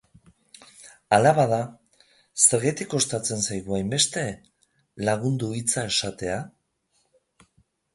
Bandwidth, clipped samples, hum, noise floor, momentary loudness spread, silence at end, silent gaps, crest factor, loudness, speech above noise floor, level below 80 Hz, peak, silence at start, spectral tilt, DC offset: 11.5 kHz; under 0.1%; none; -70 dBFS; 15 LU; 1.45 s; none; 22 dB; -23 LUFS; 47 dB; -58 dBFS; -4 dBFS; 0.8 s; -3.5 dB/octave; under 0.1%